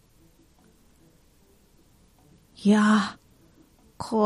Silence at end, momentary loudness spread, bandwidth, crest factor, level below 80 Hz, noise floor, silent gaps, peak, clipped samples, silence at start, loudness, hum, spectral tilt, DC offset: 0 s; 14 LU; 11.5 kHz; 20 dB; -62 dBFS; -59 dBFS; none; -8 dBFS; under 0.1%; 2.6 s; -23 LUFS; none; -6 dB/octave; under 0.1%